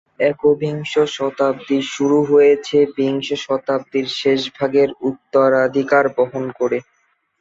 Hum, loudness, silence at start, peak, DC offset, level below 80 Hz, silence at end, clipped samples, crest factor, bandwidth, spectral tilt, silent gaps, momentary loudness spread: none; -17 LUFS; 0.2 s; -2 dBFS; under 0.1%; -62 dBFS; 0.6 s; under 0.1%; 14 dB; 7.8 kHz; -5.5 dB/octave; none; 7 LU